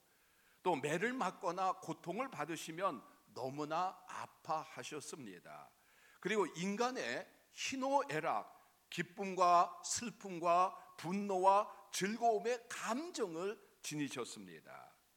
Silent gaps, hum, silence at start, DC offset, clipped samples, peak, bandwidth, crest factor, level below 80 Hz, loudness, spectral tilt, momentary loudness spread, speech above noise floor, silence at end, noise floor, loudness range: none; none; 0.65 s; under 0.1%; under 0.1%; -18 dBFS; 19 kHz; 22 dB; -88 dBFS; -39 LUFS; -4 dB/octave; 16 LU; 33 dB; 0.3 s; -72 dBFS; 8 LU